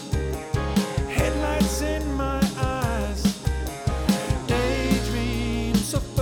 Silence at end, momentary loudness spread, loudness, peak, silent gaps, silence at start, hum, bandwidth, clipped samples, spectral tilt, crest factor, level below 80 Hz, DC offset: 0 s; 5 LU; -25 LUFS; -6 dBFS; none; 0 s; none; 19 kHz; under 0.1%; -5.5 dB/octave; 18 dB; -30 dBFS; under 0.1%